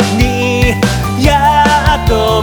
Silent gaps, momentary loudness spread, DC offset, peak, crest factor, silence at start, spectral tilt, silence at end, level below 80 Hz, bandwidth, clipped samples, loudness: none; 4 LU; under 0.1%; 0 dBFS; 10 dB; 0 s; -5 dB/octave; 0 s; -18 dBFS; over 20 kHz; under 0.1%; -11 LUFS